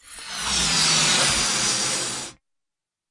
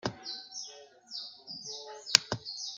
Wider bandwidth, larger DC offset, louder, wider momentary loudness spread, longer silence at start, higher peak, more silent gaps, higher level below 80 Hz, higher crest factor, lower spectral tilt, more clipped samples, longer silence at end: about the same, 11.5 kHz vs 12.5 kHz; neither; first, -19 LUFS vs -32 LUFS; second, 14 LU vs 17 LU; about the same, 0.05 s vs 0.05 s; second, -8 dBFS vs 0 dBFS; neither; first, -46 dBFS vs -70 dBFS; second, 16 dB vs 36 dB; about the same, -0.5 dB/octave vs -1 dB/octave; neither; first, 0.8 s vs 0 s